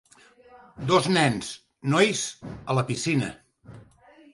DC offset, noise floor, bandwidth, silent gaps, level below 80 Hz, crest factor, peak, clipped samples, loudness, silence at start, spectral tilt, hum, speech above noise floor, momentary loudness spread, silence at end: under 0.1%; -54 dBFS; 11.5 kHz; none; -58 dBFS; 20 dB; -6 dBFS; under 0.1%; -25 LUFS; 0.75 s; -4.5 dB/octave; none; 30 dB; 13 LU; 0.5 s